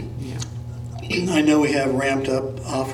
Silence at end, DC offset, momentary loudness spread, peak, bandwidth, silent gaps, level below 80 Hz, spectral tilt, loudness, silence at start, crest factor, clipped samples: 0 s; under 0.1%; 15 LU; -6 dBFS; 13.5 kHz; none; -46 dBFS; -5.5 dB/octave; -22 LUFS; 0 s; 16 dB; under 0.1%